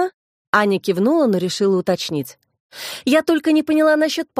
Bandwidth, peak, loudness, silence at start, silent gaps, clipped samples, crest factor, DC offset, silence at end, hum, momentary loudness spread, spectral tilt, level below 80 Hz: 15.5 kHz; 0 dBFS; -18 LUFS; 0 s; 0.14-0.53 s, 2.60-2.70 s; under 0.1%; 18 dB; under 0.1%; 0 s; none; 10 LU; -5 dB/octave; -66 dBFS